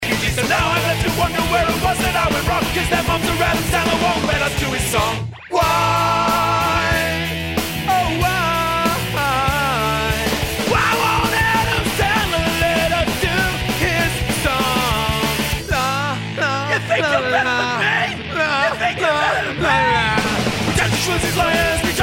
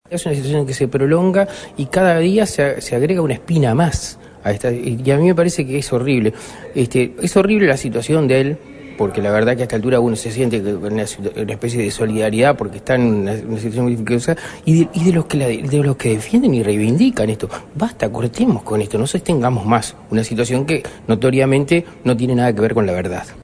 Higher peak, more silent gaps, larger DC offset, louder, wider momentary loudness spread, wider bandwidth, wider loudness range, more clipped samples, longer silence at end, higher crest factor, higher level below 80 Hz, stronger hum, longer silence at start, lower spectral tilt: about the same, -2 dBFS vs 0 dBFS; neither; neither; about the same, -17 LUFS vs -17 LUFS; second, 4 LU vs 8 LU; first, 16.5 kHz vs 11 kHz; about the same, 1 LU vs 2 LU; neither; about the same, 0 s vs 0 s; about the same, 16 dB vs 16 dB; first, -32 dBFS vs -42 dBFS; neither; about the same, 0 s vs 0.1 s; second, -4 dB/octave vs -6.5 dB/octave